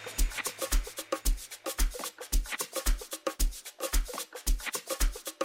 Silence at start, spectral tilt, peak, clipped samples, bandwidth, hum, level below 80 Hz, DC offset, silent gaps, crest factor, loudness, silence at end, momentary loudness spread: 0 s; -2.5 dB/octave; -14 dBFS; under 0.1%; 17 kHz; none; -32 dBFS; under 0.1%; none; 16 dB; -34 LUFS; 0 s; 4 LU